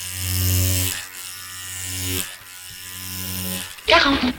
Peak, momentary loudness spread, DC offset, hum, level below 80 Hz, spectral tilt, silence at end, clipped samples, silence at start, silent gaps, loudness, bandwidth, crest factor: -2 dBFS; 16 LU; under 0.1%; none; -44 dBFS; -3 dB/octave; 0 s; under 0.1%; 0 s; none; -22 LUFS; 19.5 kHz; 22 dB